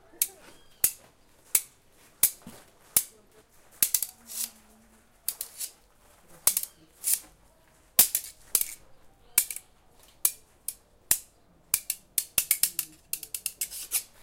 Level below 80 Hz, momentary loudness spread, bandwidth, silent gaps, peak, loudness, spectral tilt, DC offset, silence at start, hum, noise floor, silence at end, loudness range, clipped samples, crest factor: -62 dBFS; 14 LU; 17 kHz; none; -2 dBFS; -28 LUFS; 1.5 dB/octave; under 0.1%; 0.2 s; none; -60 dBFS; 0.15 s; 4 LU; under 0.1%; 30 dB